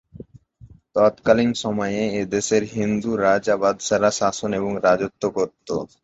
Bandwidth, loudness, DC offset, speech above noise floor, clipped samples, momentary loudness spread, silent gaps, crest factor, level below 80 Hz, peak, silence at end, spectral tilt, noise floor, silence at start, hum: 8.2 kHz; -21 LUFS; under 0.1%; 28 dB; under 0.1%; 6 LU; none; 18 dB; -54 dBFS; -2 dBFS; 0.15 s; -4.5 dB/octave; -49 dBFS; 0.15 s; none